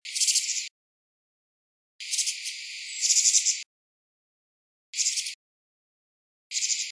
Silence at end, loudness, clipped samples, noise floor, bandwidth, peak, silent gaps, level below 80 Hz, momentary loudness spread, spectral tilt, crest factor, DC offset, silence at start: 0 s; -24 LUFS; under 0.1%; under -90 dBFS; 11 kHz; -8 dBFS; 0.71-1.99 s, 3.66-4.93 s, 5.34-6.50 s; under -90 dBFS; 16 LU; 12 dB/octave; 22 dB; under 0.1%; 0.05 s